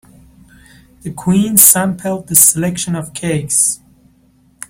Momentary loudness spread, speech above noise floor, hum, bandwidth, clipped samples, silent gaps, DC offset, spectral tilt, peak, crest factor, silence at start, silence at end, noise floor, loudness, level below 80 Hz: 16 LU; 38 dB; none; over 20 kHz; 0.3%; none; under 0.1%; -3.5 dB/octave; 0 dBFS; 16 dB; 1.05 s; 0.95 s; -52 dBFS; -11 LUFS; -48 dBFS